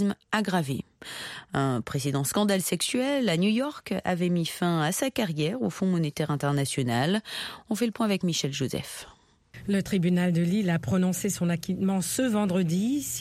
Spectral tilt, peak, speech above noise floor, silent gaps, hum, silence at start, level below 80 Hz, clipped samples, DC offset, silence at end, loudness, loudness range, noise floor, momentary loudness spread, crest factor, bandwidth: -5 dB/octave; -8 dBFS; 24 dB; none; none; 0 s; -60 dBFS; under 0.1%; under 0.1%; 0 s; -27 LUFS; 2 LU; -50 dBFS; 8 LU; 18 dB; 16 kHz